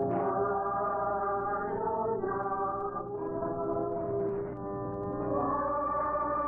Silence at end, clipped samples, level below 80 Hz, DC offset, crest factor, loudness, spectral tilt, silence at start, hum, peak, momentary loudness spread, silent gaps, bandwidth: 0 s; under 0.1%; -56 dBFS; under 0.1%; 12 dB; -32 LUFS; -12 dB/octave; 0 s; 60 Hz at -55 dBFS; -20 dBFS; 6 LU; none; 2.8 kHz